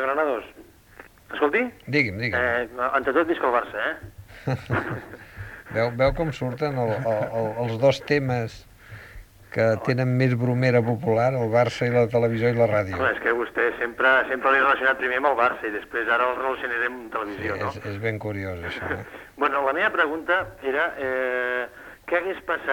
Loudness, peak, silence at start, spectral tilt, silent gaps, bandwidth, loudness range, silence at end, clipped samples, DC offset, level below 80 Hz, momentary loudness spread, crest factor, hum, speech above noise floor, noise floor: -23 LUFS; -6 dBFS; 0 s; -7 dB/octave; none; 18.5 kHz; 5 LU; 0 s; under 0.1%; under 0.1%; -50 dBFS; 10 LU; 18 dB; none; 25 dB; -49 dBFS